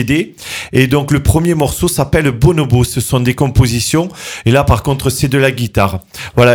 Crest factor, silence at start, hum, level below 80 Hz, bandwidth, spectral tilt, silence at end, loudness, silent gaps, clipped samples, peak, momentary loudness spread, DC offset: 12 dB; 0 s; none; -26 dBFS; 19.5 kHz; -5.5 dB/octave; 0 s; -13 LUFS; none; 0.1%; 0 dBFS; 5 LU; under 0.1%